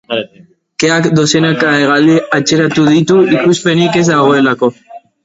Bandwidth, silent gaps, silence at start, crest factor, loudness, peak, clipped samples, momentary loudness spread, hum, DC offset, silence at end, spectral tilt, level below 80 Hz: 8 kHz; none; 0.1 s; 10 dB; -10 LUFS; 0 dBFS; under 0.1%; 7 LU; none; under 0.1%; 0.25 s; -5 dB/octave; -50 dBFS